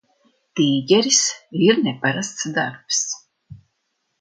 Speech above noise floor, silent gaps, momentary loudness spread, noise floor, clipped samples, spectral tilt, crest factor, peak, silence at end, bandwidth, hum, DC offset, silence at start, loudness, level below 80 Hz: 54 dB; none; 10 LU; -73 dBFS; under 0.1%; -3 dB/octave; 20 dB; -2 dBFS; 0.65 s; 10.5 kHz; none; under 0.1%; 0.55 s; -19 LUFS; -64 dBFS